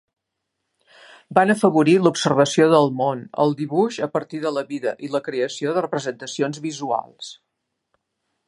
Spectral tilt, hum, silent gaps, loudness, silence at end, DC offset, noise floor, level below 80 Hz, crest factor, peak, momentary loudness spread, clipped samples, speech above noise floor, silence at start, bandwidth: -5.5 dB/octave; none; none; -20 LUFS; 1.15 s; under 0.1%; -79 dBFS; -70 dBFS; 20 dB; 0 dBFS; 11 LU; under 0.1%; 59 dB; 1.3 s; 11.5 kHz